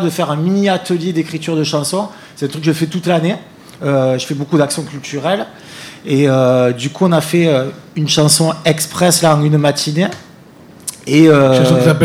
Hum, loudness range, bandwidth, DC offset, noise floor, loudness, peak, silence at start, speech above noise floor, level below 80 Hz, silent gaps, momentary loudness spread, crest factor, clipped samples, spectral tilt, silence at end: none; 5 LU; 16 kHz; under 0.1%; -40 dBFS; -14 LUFS; 0 dBFS; 0 s; 26 dB; -56 dBFS; none; 14 LU; 14 dB; under 0.1%; -5 dB/octave; 0 s